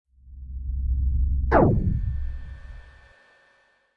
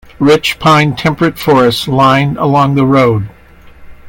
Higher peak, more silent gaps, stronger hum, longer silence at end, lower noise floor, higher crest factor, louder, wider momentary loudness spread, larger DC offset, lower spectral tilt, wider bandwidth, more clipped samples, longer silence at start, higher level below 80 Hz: second, -6 dBFS vs 0 dBFS; neither; neither; first, 1.05 s vs 0 s; first, -63 dBFS vs -36 dBFS; first, 20 dB vs 10 dB; second, -25 LUFS vs -10 LUFS; first, 24 LU vs 4 LU; neither; first, -11 dB/octave vs -6 dB/octave; second, 4.8 kHz vs 17.5 kHz; neither; about the same, 0.25 s vs 0.2 s; first, -28 dBFS vs -40 dBFS